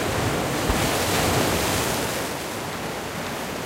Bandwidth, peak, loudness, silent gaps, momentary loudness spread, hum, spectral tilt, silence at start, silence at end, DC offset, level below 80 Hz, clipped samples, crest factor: 16 kHz; -6 dBFS; -24 LUFS; none; 8 LU; none; -3.5 dB/octave; 0 s; 0 s; under 0.1%; -38 dBFS; under 0.1%; 18 dB